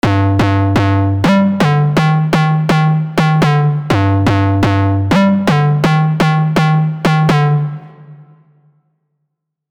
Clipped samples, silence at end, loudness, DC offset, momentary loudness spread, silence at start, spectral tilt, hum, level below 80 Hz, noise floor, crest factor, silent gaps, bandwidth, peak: under 0.1%; 1.5 s; -12 LUFS; 0.2%; 2 LU; 0.05 s; -7.5 dB/octave; none; -40 dBFS; -72 dBFS; 12 dB; none; 11 kHz; -2 dBFS